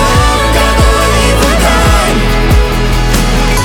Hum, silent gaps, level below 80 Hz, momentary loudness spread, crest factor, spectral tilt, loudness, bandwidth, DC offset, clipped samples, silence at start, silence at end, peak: none; none; -12 dBFS; 3 LU; 8 dB; -4.5 dB/octave; -9 LUFS; 18.5 kHz; under 0.1%; under 0.1%; 0 s; 0 s; 0 dBFS